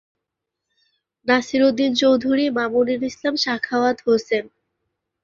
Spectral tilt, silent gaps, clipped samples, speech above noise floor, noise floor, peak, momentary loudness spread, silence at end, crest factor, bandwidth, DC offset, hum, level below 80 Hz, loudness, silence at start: -4 dB/octave; none; under 0.1%; 63 dB; -82 dBFS; -4 dBFS; 6 LU; 0.75 s; 18 dB; 7.4 kHz; under 0.1%; none; -62 dBFS; -20 LUFS; 1.25 s